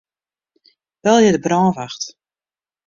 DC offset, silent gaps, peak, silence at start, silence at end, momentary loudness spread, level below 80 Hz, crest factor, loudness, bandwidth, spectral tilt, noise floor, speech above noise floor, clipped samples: under 0.1%; none; -2 dBFS; 1.05 s; 0.75 s; 15 LU; -58 dBFS; 18 dB; -16 LUFS; 7.6 kHz; -5 dB/octave; under -90 dBFS; over 75 dB; under 0.1%